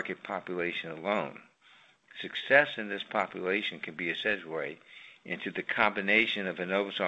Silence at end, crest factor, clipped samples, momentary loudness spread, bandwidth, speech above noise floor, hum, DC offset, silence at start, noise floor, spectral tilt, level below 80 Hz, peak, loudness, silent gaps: 0 s; 24 dB; under 0.1%; 16 LU; 8.4 kHz; 30 dB; none; under 0.1%; 0 s; -61 dBFS; -5.5 dB/octave; -74 dBFS; -8 dBFS; -30 LUFS; none